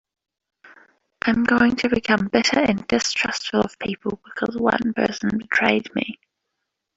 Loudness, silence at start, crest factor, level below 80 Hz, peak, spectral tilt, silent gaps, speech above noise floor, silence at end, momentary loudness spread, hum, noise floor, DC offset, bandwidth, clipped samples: -21 LUFS; 0.65 s; 20 dB; -54 dBFS; -2 dBFS; -4 dB/octave; none; 58 dB; 0.8 s; 10 LU; none; -79 dBFS; under 0.1%; 7.8 kHz; under 0.1%